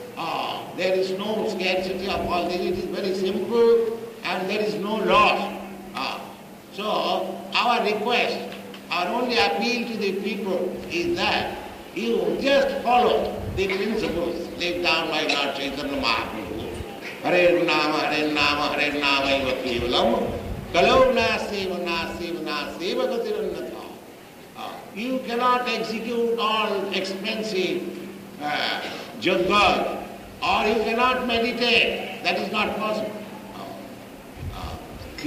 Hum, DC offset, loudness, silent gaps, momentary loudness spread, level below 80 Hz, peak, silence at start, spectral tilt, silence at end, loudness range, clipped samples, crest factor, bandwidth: none; under 0.1%; -23 LUFS; none; 16 LU; -48 dBFS; -6 dBFS; 0 s; -4.5 dB/octave; 0 s; 5 LU; under 0.1%; 18 dB; 15.5 kHz